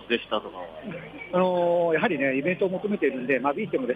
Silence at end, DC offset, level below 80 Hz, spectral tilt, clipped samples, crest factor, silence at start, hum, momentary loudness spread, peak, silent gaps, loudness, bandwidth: 0 s; under 0.1%; -64 dBFS; -8 dB/octave; under 0.1%; 16 dB; 0 s; none; 15 LU; -10 dBFS; none; -25 LUFS; 4.9 kHz